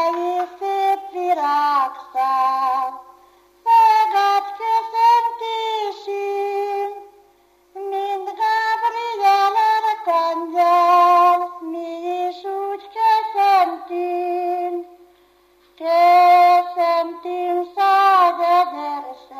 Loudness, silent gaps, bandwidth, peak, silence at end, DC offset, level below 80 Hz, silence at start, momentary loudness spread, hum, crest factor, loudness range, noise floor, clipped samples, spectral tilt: -18 LUFS; none; 15 kHz; -4 dBFS; 0 s; under 0.1%; -72 dBFS; 0 s; 13 LU; 50 Hz at -75 dBFS; 14 dB; 6 LU; -56 dBFS; under 0.1%; -1.5 dB/octave